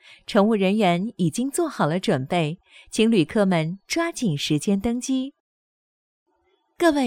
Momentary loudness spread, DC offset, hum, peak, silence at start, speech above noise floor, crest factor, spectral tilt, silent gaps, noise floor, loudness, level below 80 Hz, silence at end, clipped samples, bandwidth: 7 LU; under 0.1%; none; -4 dBFS; 0.1 s; 46 dB; 20 dB; -5.5 dB/octave; 5.40-6.26 s; -68 dBFS; -23 LUFS; -56 dBFS; 0 s; under 0.1%; 16.5 kHz